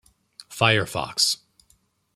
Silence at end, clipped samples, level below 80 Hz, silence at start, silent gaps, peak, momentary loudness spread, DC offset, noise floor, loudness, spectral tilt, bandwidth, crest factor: 0.8 s; under 0.1%; -58 dBFS; 0.4 s; none; -2 dBFS; 11 LU; under 0.1%; -64 dBFS; -22 LUFS; -2.5 dB/octave; 15.5 kHz; 24 dB